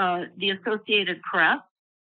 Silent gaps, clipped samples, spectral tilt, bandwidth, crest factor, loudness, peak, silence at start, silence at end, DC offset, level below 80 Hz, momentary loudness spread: none; under 0.1%; -0.5 dB/octave; 4.6 kHz; 18 dB; -24 LUFS; -8 dBFS; 0 s; 0.5 s; under 0.1%; -82 dBFS; 6 LU